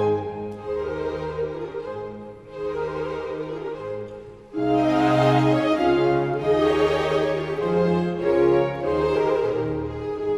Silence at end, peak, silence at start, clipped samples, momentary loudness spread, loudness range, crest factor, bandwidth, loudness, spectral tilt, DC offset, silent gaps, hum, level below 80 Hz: 0 s; -6 dBFS; 0 s; under 0.1%; 14 LU; 9 LU; 16 dB; 11 kHz; -23 LUFS; -7.5 dB/octave; under 0.1%; none; none; -48 dBFS